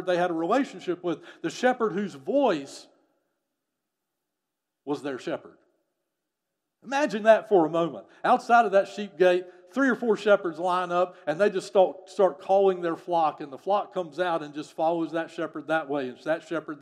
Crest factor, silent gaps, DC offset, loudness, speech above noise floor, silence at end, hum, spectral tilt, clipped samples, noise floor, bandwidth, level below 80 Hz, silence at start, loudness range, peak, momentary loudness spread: 22 dB; none; under 0.1%; -26 LUFS; 59 dB; 0.05 s; none; -5.5 dB/octave; under 0.1%; -85 dBFS; 12 kHz; -86 dBFS; 0 s; 14 LU; -4 dBFS; 13 LU